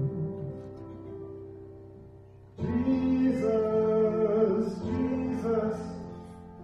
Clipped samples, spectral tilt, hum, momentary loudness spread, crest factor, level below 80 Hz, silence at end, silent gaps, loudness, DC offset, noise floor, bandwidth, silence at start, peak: under 0.1%; -9 dB/octave; none; 19 LU; 16 dB; -54 dBFS; 0 s; none; -28 LUFS; under 0.1%; -51 dBFS; 8.4 kHz; 0 s; -14 dBFS